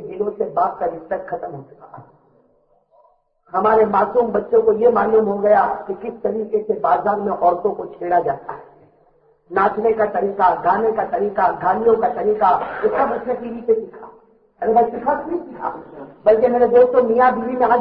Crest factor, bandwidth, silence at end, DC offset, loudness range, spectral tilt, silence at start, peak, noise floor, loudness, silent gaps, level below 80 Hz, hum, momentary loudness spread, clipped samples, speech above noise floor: 16 dB; 5 kHz; 0 s; under 0.1%; 5 LU; -10.5 dB/octave; 0 s; -2 dBFS; -59 dBFS; -18 LUFS; none; -54 dBFS; none; 13 LU; under 0.1%; 42 dB